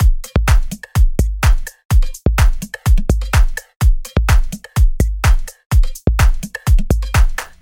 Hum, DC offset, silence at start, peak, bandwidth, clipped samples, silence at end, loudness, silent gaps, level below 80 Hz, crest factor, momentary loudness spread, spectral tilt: none; under 0.1%; 0 s; 0 dBFS; 17 kHz; under 0.1%; 0.15 s; -17 LUFS; 1.85-1.89 s, 3.76-3.80 s, 5.66-5.70 s; -14 dBFS; 12 dB; 4 LU; -5.5 dB/octave